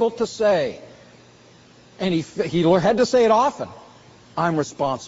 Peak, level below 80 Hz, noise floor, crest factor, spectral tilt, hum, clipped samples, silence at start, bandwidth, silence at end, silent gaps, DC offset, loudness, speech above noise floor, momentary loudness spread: -6 dBFS; -56 dBFS; -50 dBFS; 16 dB; -5 dB/octave; none; under 0.1%; 0 s; 8 kHz; 0 s; none; under 0.1%; -20 LUFS; 30 dB; 14 LU